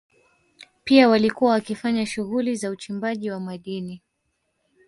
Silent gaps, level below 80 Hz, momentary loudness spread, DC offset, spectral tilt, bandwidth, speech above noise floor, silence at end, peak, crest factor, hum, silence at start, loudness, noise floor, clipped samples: none; -62 dBFS; 16 LU; under 0.1%; -5.5 dB/octave; 11.5 kHz; 52 dB; 0.9 s; -4 dBFS; 20 dB; none; 0.6 s; -22 LUFS; -74 dBFS; under 0.1%